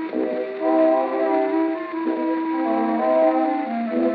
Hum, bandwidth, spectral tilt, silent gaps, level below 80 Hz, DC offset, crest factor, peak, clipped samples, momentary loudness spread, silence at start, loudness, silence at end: none; 4.9 kHz; -4.5 dB/octave; none; -86 dBFS; under 0.1%; 14 dB; -8 dBFS; under 0.1%; 7 LU; 0 s; -21 LUFS; 0 s